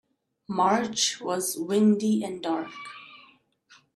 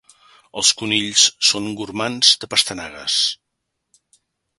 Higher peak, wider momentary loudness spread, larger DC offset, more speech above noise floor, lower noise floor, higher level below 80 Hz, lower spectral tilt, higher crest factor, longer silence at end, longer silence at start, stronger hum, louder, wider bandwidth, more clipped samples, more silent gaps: second, -10 dBFS vs 0 dBFS; first, 17 LU vs 13 LU; neither; second, 34 dB vs 58 dB; second, -59 dBFS vs -77 dBFS; second, -76 dBFS vs -60 dBFS; first, -4 dB/octave vs -0.5 dB/octave; about the same, 18 dB vs 22 dB; second, 0.8 s vs 1.25 s; about the same, 0.5 s vs 0.55 s; neither; second, -25 LUFS vs -16 LUFS; first, 14 kHz vs 12 kHz; neither; neither